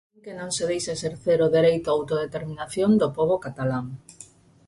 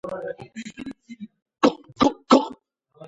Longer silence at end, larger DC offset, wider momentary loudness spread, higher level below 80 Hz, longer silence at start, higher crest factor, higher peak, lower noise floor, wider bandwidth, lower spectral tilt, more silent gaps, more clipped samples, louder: first, 0.45 s vs 0 s; neither; second, 13 LU vs 22 LU; about the same, -58 dBFS vs -60 dBFS; first, 0.25 s vs 0.05 s; second, 16 dB vs 22 dB; second, -10 dBFS vs -2 dBFS; about the same, -50 dBFS vs -51 dBFS; first, 11.5 kHz vs 8 kHz; about the same, -5.5 dB/octave vs -5 dB/octave; second, none vs 1.42-1.46 s; neither; second, -24 LUFS vs -21 LUFS